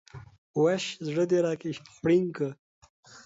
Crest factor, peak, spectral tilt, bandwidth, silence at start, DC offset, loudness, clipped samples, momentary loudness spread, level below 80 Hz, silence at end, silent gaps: 16 dB; -14 dBFS; -6 dB/octave; 8 kHz; 0.15 s; under 0.1%; -28 LUFS; under 0.1%; 9 LU; -66 dBFS; 0.05 s; 0.38-0.54 s, 2.59-2.82 s, 2.90-3.03 s